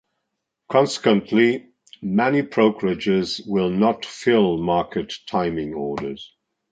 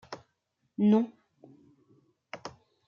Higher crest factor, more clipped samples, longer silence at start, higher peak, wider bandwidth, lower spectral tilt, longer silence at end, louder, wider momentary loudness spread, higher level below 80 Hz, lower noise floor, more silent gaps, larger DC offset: about the same, 18 dB vs 20 dB; neither; first, 0.7 s vs 0.1 s; first, -2 dBFS vs -12 dBFS; first, 9.2 kHz vs 7 kHz; second, -6 dB/octave vs -8 dB/octave; about the same, 0.45 s vs 0.35 s; first, -21 LUFS vs -27 LUFS; second, 10 LU vs 22 LU; first, -54 dBFS vs -78 dBFS; about the same, -78 dBFS vs -78 dBFS; neither; neither